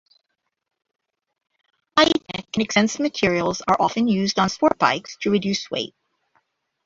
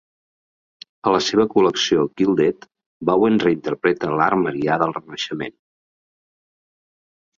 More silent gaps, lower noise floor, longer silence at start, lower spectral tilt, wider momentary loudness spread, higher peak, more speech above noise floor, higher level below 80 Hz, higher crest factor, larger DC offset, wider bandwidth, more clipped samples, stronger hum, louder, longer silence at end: second, none vs 2.86-3.00 s; second, -76 dBFS vs under -90 dBFS; first, 1.95 s vs 1.05 s; about the same, -4 dB/octave vs -5 dB/octave; second, 7 LU vs 10 LU; about the same, -2 dBFS vs -2 dBFS; second, 55 dB vs over 71 dB; about the same, -56 dBFS vs -58 dBFS; about the same, 22 dB vs 18 dB; neither; about the same, 7.8 kHz vs 7.6 kHz; neither; neither; about the same, -21 LUFS vs -19 LUFS; second, 0.95 s vs 1.85 s